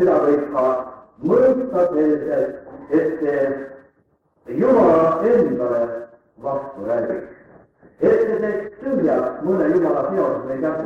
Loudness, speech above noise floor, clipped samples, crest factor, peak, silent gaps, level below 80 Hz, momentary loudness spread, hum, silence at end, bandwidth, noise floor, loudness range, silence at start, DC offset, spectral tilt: -19 LUFS; 44 dB; under 0.1%; 14 dB; -4 dBFS; none; -56 dBFS; 11 LU; none; 0 s; 7 kHz; -62 dBFS; 3 LU; 0 s; under 0.1%; -9 dB/octave